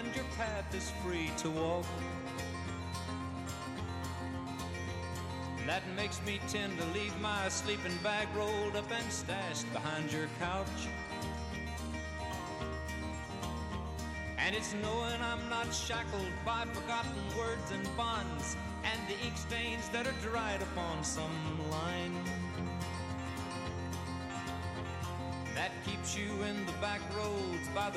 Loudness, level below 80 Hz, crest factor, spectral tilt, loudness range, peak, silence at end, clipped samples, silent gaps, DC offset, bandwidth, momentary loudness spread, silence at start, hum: -38 LUFS; -50 dBFS; 18 dB; -4 dB/octave; 4 LU; -20 dBFS; 0 s; under 0.1%; none; under 0.1%; 15.5 kHz; 6 LU; 0 s; none